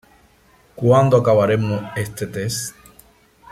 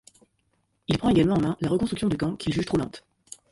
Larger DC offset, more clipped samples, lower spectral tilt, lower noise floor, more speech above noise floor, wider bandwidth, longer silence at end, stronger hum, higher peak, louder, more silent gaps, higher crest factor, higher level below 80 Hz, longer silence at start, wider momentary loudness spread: neither; neither; about the same, -6 dB/octave vs -6.5 dB/octave; second, -54 dBFS vs -71 dBFS; second, 37 dB vs 47 dB; first, 15.5 kHz vs 11.5 kHz; first, 0.8 s vs 0.5 s; neither; first, -2 dBFS vs -10 dBFS; first, -18 LUFS vs -25 LUFS; neither; about the same, 16 dB vs 16 dB; about the same, -52 dBFS vs -48 dBFS; second, 0.75 s vs 0.9 s; second, 13 LU vs 17 LU